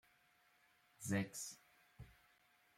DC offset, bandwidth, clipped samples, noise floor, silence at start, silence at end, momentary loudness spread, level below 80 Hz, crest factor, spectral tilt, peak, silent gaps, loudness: under 0.1%; 16.5 kHz; under 0.1%; -75 dBFS; 1 s; 0.65 s; 21 LU; -76 dBFS; 22 dB; -4.5 dB/octave; -28 dBFS; none; -45 LUFS